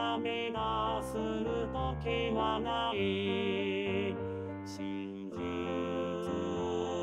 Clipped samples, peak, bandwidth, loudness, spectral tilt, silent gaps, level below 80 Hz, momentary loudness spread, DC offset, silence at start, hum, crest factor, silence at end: under 0.1%; -18 dBFS; 14 kHz; -35 LUFS; -6 dB/octave; none; -52 dBFS; 7 LU; under 0.1%; 0 s; none; 16 dB; 0 s